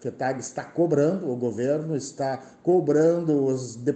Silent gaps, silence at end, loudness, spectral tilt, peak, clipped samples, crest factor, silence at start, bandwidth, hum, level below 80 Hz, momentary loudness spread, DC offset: none; 0 s; -25 LUFS; -7 dB/octave; -10 dBFS; under 0.1%; 14 dB; 0 s; 9 kHz; none; -70 dBFS; 9 LU; under 0.1%